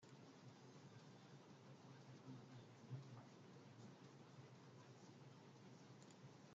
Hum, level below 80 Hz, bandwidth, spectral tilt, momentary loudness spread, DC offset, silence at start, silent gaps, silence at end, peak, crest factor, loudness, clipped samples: none; under -90 dBFS; 7.6 kHz; -6 dB/octave; 6 LU; under 0.1%; 0 s; none; 0 s; -44 dBFS; 18 dB; -63 LUFS; under 0.1%